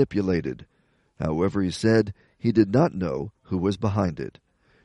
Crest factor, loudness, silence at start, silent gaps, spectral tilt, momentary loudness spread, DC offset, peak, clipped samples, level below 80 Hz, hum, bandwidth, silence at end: 18 dB; -25 LUFS; 0 s; none; -7.5 dB/octave; 12 LU; under 0.1%; -6 dBFS; under 0.1%; -50 dBFS; none; 11.5 kHz; 0.55 s